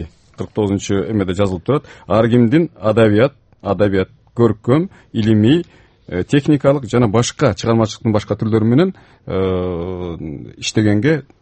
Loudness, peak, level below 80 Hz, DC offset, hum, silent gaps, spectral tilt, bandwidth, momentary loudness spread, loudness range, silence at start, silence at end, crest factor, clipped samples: -16 LUFS; 0 dBFS; -44 dBFS; under 0.1%; none; none; -6.5 dB/octave; 8.8 kHz; 12 LU; 2 LU; 0 s; 0.2 s; 16 dB; under 0.1%